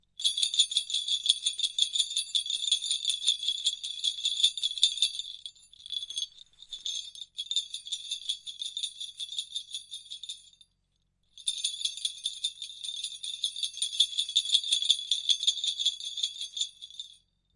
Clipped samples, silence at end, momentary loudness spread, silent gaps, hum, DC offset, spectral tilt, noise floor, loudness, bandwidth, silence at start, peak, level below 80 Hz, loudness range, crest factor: under 0.1%; 0.4 s; 14 LU; none; none; under 0.1%; 5.5 dB/octave; -75 dBFS; -28 LUFS; 11.5 kHz; 0.2 s; -6 dBFS; -76 dBFS; 9 LU; 26 dB